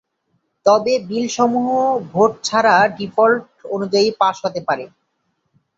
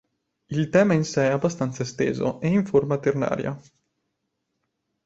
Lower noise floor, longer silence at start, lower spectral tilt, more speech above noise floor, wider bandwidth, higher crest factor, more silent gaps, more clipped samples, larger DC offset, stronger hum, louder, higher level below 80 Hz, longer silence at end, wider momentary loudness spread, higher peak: second, -69 dBFS vs -78 dBFS; first, 0.65 s vs 0.5 s; second, -4 dB/octave vs -6.5 dB/octave; about the same, 53 dB vs 55 dB; about the same, 8 kHz vs 8 kHz; about the same, 16 dB vs 18 dB; neither; neither; neither; neither; first, -17 LUFS vs -23 LUFS; about the same, -62 dBFS vs -58 dBFS; second, 0.9 s vs 1.45 s; about the same, 9 LU vs 9 LU; first, -2 dBFS vs -6 dBFS